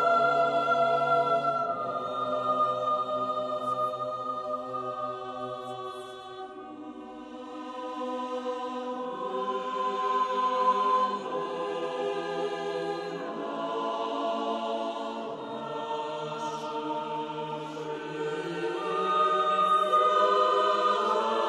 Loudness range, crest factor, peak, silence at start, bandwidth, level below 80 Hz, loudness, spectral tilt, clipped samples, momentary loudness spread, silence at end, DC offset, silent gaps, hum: 11 LU; 18 dB; -12 dBFS; 0 s; 12 kHz; -74 dBFS; -29 LUFS; -4.5 dB/octave; under 0.1%; 13 LU; 0 s; under 0.1%; none; none